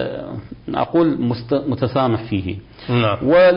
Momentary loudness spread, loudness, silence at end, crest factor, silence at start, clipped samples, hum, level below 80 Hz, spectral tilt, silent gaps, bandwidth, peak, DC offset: 14 LU; -19 LUFS; 0 s; 12 dB; 0 s; under 0.1%; none; -44 dBFS; -12 dB/octave; none; 5.4 kHz; -6 dBFS; under 0.1%